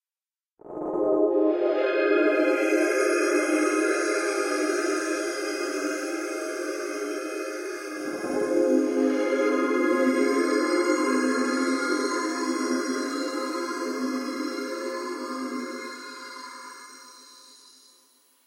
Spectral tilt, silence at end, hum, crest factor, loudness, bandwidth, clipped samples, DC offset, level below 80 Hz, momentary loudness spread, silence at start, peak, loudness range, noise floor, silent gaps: -2.5 dB/octave; 0.95 s; none; 16 dB; -26 LUFS; 16 kHz; under 0.1%; under 0.1%; -76 dBFS; 12 LU; 0.65 s; -10 dBFS; 9 LU; under -90 dBFS; none